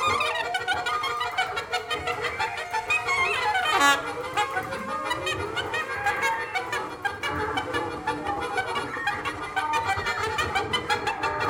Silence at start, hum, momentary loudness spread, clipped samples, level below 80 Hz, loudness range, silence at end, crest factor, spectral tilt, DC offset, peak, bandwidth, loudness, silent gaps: 0 s; none; 7 LU; under 0.1%; -52 dBFS; 4 LU; 0 s; 22 dB; -2.5 dB/octave; under 0.1%; -6 dBFS; 19.5 kHz; -26 LUFS; none